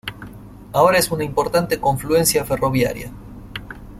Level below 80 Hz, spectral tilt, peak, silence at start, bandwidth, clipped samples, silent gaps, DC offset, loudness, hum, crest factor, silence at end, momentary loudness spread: -40 dBFS; -4 dB/octave; -2 dBFS; 0.05 s; 16.5 kHz; under 0.1%; none; under 0.1%; -18 LUFS; 50 Hz at -40 dBFS; 18 dB; 0 s; 19 LU